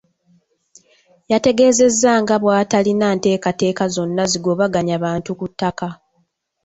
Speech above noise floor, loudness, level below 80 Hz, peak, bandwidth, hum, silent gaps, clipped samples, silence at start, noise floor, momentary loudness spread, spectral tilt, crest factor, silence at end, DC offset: 49 dB; -17 LUFS; -54 dBFS; -2 dBFS; 8.2 kHz; none; none; under 0.1%; 1.3 s; -65 dBFS; 10 LU; -4.5 dB/octave; 16 dB; 0.7 s; under 0.1%